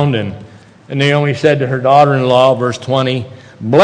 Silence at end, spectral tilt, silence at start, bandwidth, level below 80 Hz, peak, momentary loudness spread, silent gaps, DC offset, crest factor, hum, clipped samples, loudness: 0 s; -6.5 dB/octave; 0 s; 9.6 kHz; -52 dBFS; 0 dBFS; 15 LU; none; under 0.1%; 12 dB; none; 0.3%; -12 LUFS